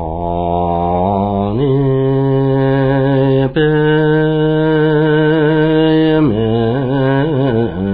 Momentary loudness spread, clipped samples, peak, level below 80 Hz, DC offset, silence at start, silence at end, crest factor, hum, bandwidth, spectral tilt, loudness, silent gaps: 4 LU; under 0.1%; -2 dBFS; -34 dBFS; under 0.1%; 0 s; 0 s; 10 dB; none; 4.9 kHz; -11.5 dB/octave; -13 LUFS; none